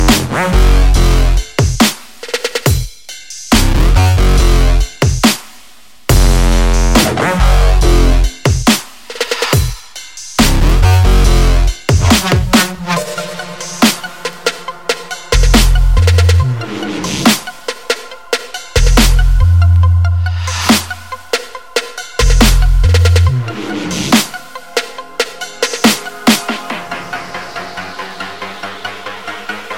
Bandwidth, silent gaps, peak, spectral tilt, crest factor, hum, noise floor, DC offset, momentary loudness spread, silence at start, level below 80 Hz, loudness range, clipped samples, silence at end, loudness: 17 kHz; none; 0 dBFS; -4.5 dB/octave; 12 dB; none; -43 dBFS; 2%; 14 LU; 0 s; -14 dBFS; 4 LU; 0.1%; 0 s; -13 LUFS